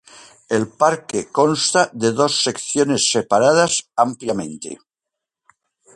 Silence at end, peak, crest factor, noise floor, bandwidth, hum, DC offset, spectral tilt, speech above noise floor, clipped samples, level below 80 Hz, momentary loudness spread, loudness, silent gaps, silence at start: 1.2 s; -2 dBFS; 18 dB; -84 dBFS; 11.5 kHz; none; under 0.1%; -3 dB/octave; 66 dB; under 0.1%; -60 dBFS; 10 LU; -18 LUFS; none; 0.15 s